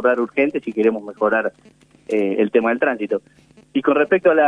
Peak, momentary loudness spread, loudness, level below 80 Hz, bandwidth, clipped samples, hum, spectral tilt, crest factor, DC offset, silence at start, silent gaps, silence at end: -2 dBFS; 8 LU; -19 LUFS; -64 dBFS; 9.8 kHz; under 0.1%; none; -7 dB/octave; 16 dB; under 0.1%; 0 s; none; 0 s